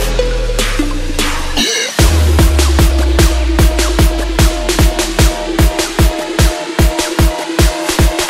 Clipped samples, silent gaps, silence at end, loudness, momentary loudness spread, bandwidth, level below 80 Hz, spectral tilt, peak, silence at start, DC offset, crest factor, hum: under 0.1%; none; 0 s; -13 LUFS; 5 LU; 16.5 kHz; -14 dBFS; -4.5 dB/octave; 0 dBFS; 0 s; 0.2%; 12 dB; none